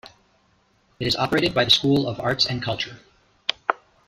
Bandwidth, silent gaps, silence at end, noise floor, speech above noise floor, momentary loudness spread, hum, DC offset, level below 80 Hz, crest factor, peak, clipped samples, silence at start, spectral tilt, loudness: 15.5 kHz; none; 0.3 s; -63 dBFS; 41 dB; 11 LU; none; under 0.1%; -52 dBFS; 22 dB; -2 dBFS; under 0.1%; 0.05 s; -4.5 dB/octave; -22 LUFS